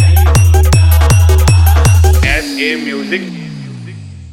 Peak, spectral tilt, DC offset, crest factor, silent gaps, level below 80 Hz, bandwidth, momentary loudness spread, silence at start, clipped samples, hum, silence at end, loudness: 0 dBFS; -5 dB/octave; under 0.1%; 8 dB; none; -16 dBFS; 16.5 kHz; 18 LU; 0 s; under 0.1%; none; 0.05 s; -10 LUFS